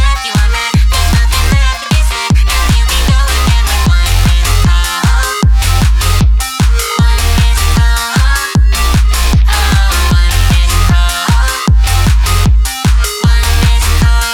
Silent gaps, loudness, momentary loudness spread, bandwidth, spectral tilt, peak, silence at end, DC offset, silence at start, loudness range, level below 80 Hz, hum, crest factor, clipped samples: none; -11 LUFS; 2 LU; 18 kHz; -4 dB/octave; 0 dBFS; 0 s; under 0.1%; 0 s; 0 LU; -10 dBFS; none; 8 dB; under 0.1%